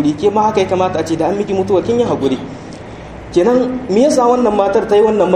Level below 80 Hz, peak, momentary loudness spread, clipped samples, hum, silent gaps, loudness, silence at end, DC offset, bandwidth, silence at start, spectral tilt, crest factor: -42 dBFS; 0 dBFS; 18 LU; under 0.1%; none; none; -14 LUFS; 0 s; under 0.1%; 11.5 kHz; 0 s; -6 dB/octave; 14 dB